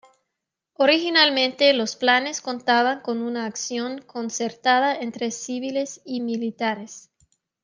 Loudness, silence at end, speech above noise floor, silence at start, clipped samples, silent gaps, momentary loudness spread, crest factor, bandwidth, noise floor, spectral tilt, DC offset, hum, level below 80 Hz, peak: -22 LUFS; 0.65 s; 60 dB; 0.8 s; under 0.1%; none; 12 LU; 20 dB; 10 kHz; -83 dBFS; -2 dB/octave; under 0.1%; none; -78 dBFS; -4 dBFS